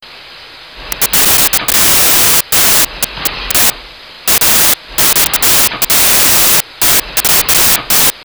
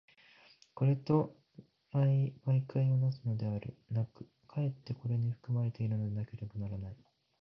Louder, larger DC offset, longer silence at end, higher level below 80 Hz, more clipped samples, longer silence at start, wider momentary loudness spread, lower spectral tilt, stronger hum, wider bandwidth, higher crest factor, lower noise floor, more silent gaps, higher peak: first, -7 LUFS vs -35 LUFS; first, 0.2% vs under 0.1%; second, 0 s vs 0.45 s; first, -34 dBFS vs -64 dBFS; neither; second, 0.05 s vs 0.75 s; second, 7 LU vs 12 LU; second, 0 dB/octave vs -11 dB/octave; neither; first, over 20 kHz vs 5.8 kHz; second, 10 dB vs 18 dB; second, -33 dBFS vs -63 dBFS; neither; first, 0 dBFS vs -16 dBFS